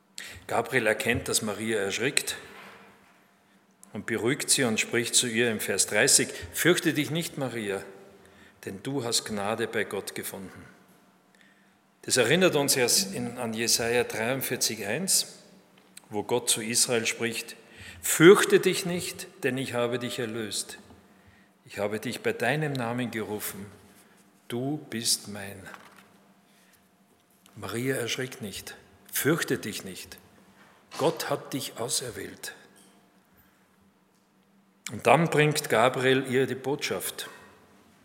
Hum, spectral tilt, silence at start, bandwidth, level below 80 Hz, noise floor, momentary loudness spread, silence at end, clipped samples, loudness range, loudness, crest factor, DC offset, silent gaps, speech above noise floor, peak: none; -3 dB/octave; 0.2 s; 16.5 kHz; -66 dBFS; -64 dBFS; 19 LU; 0.6 s; under 0.1%; 10 LU; -26 LUFS; 28 dB; under 0.1%; none; 37 dB; 0 dBFS